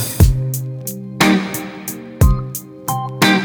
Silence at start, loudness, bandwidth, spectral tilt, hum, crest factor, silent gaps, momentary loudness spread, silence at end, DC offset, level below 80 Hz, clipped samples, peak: 0 s; -18 LUFS; over 20 kHz; -5 dB/octave; none; 16 dB; none; 13 LU; 0 s; under 0.1%; -24 dBFS; under 0.1%; 0 dBFS